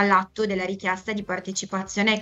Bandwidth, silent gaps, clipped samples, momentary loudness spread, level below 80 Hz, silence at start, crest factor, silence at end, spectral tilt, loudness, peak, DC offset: 8.2 kHz; none; under 0.1%; 7 LU; -58 dBFS; 0 s; 18 dB; 0 s; -4 dB/octave; -25 LUFS; -6 dBFS; under 0.1%